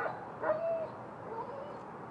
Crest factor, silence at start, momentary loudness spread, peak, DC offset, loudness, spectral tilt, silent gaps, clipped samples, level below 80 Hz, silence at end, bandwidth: 18 dB; 0 s; 11 LU; -22 dBFS; under 0.1%; -38 LUFS; -7.5 dB/octave; none; under 0.1%; -74 dBFS; 0 s; 8.4 kHz